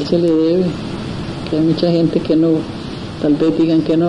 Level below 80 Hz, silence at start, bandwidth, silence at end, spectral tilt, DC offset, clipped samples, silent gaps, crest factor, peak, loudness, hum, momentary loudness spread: -42 dBFS; 0 s; 10 kHz; 0 s; -8 dB/octave; 0.2%; under 0.1%; none; 14 dB; -2 dBFS; -16 LUFS; none; 11 LU